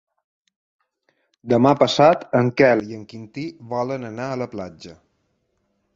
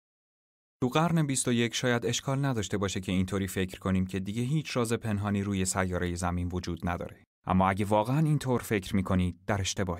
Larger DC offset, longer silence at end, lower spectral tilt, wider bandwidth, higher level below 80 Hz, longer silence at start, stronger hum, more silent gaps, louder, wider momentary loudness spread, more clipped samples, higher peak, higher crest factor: neither; first, 1 s vs 0 s; about the same, -6 dB/octave vs -5 dB/octave; second, 7.8 kHz vs 16 kHz; second, -60 dBFS vs -52 dBFS; first, 1.45 s vs 0.8 s; neither; second, none vs 7.27-7.42 s; first, -19 LUFS vs -29 LUFS; first, 19 LU vs 7 LU; neither; first, -2 dBFS vs -10 dBFS; about the same, 20 dB vs 18 dB